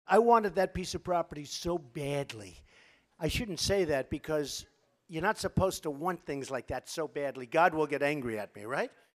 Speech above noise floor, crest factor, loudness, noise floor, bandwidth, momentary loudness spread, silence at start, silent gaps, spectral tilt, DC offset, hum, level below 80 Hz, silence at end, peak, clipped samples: 31 dB; 22 dB; -32 LUFS; -63 dBFS; 15.5 kHz; 11 LU; 0.1 s; none; -4.5 dB/octave; under 0.1%; none; -54 dBFS; 0.25 s; -10 dBFS; under 0.1%